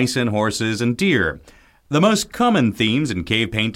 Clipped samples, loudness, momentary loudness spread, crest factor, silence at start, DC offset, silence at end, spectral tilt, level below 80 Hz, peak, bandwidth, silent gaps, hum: under 0.1%; -19 LUFS; 4 LU; 16 dB; 0 s; under 0.1%; 0 s; -5 dB/octave; -46 dBFS; -4 dBFS; 16.5 kHz; none; none